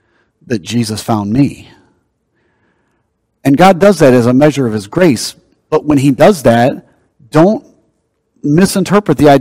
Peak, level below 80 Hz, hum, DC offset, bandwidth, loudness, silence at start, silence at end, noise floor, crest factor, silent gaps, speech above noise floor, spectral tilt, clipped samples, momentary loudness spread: 0 dBFS; -42 dBFS; none; under 0.1%; 16.5 kHz; -11 LUFS; 0.5 s; 0 s; -63 dBFS; 12 dB; none; 54 dB; -6 dB/octave; 2%; 10 LU